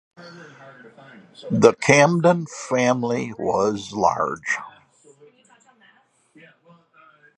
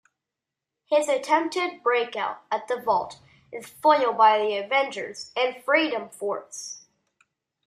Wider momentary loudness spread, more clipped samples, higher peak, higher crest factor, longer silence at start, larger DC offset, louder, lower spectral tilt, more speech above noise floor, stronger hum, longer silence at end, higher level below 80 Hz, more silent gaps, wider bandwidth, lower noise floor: about the same, 16 LU vs 17 LU; neither; first, 0 dBFS vs -6 dBFS; about the same, 22 dB vs 20 dB; second, 0.2 s vs 0.9 s; neither; first, -20 LUFS vs -24 LUFS; first, -5 dB/octave vs -2.5 dB/octave; second, 38 dB vs 63 dB; neither; first, 2.7 s vs 0.9 s; first, -60 dBFS vs -74 dBFS; neither; second, 11 kHz vs 15 kHz; second, -59 dBFS vs -87 dBFS